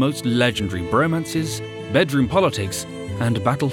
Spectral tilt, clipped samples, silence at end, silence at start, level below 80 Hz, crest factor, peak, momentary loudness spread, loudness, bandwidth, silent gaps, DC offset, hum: -5.5 dB/octave; under 0.1%; 0 s; 0 s; -48 dBFS; 18 dB; -2 dBFS; 9 LU; -21 LUFS; 18 kHz; none; under 0.1%; none